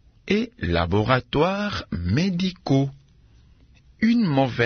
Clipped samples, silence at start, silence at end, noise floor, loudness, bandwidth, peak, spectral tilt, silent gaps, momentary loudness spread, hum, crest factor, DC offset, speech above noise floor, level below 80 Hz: under 0.1%; 0.25 s; 0 s; -53 dBFS; -23 LUFS; 6.6 kHz; -4 dBFS; -7 dB/octave; none; 6 LU; none; 18 dB; under 0.1%; 32 dB; -46 dBFS